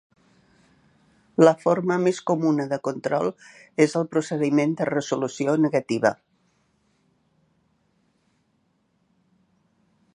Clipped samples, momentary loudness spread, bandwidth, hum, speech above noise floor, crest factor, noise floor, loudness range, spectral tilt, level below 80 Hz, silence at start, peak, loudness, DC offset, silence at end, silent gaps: under 0.1%; 9 LU; 10.5 kHz; none; 47 dB; 22 dB; -69 dBFS; 5 LU; -6.5 dB/octave; -72 dBFS; 1.4 s; -2 dBFS; -23 LUFS; under 0.1%; 4 s; none